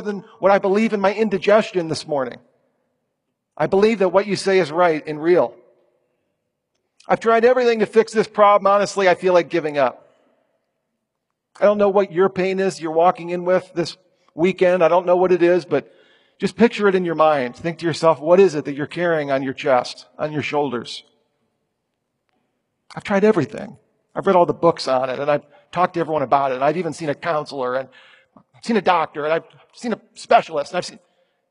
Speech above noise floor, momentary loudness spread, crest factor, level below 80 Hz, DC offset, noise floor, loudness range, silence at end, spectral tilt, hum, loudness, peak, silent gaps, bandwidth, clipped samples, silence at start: 59 dB; 12 LU; 18 dB; -64 dBFS; under 0.1%; -78 dBFS; 6 LU; 0.55 s; -6 dB/octave; none; -19 LUFS; 0 dBFS; none; 11 kHz; under 0.1%; 0 s